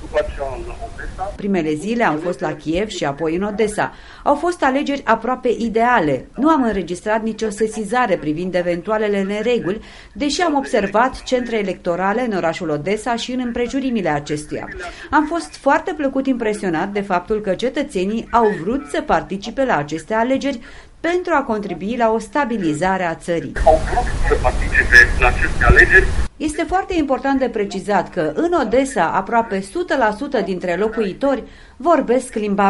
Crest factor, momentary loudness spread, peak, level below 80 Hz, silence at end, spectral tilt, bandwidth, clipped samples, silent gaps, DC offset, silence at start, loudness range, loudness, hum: 18 dB; 8 LU; 0 dBFS; -30 dBFS; 0 s; -5.5 dB/octave; 11.5 kHz; under 0.1%; none; under 0.1%; 0 s; 7 LU; -18 LUFS; none